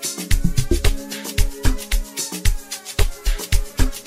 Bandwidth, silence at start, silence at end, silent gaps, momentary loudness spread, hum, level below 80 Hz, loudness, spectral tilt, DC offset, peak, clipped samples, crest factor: 16 kHz; 0 s; 0 s; none; 5 LU; none; -22 dBFS; -24 LUFS; -4 dB/octave; 1%; -2 dBFS; under 0.1%; 18 dB